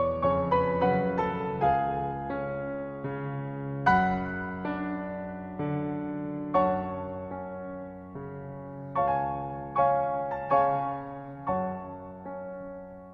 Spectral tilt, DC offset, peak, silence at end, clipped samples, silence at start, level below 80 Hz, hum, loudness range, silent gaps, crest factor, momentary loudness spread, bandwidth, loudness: -9 dB/octave; under 0.1%; -8 dBFS; 0 s; under 0.1%; 0 s; -52 dBFS; none; 4 LU; none; 22 dB; 15 LU; 6.6 kHz; -30 LUFS